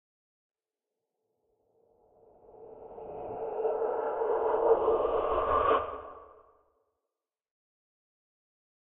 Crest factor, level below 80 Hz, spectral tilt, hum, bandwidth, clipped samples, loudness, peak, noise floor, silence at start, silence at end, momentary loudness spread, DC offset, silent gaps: 22 dB; -58 dBFS; -4 dB/octave; none; 3.8 kHz; under 0.1%; -29 LUFS; -12 dBFS; -90 dBFS; 2.6 s; 2.55 s; 21 LU; under 0.1%; none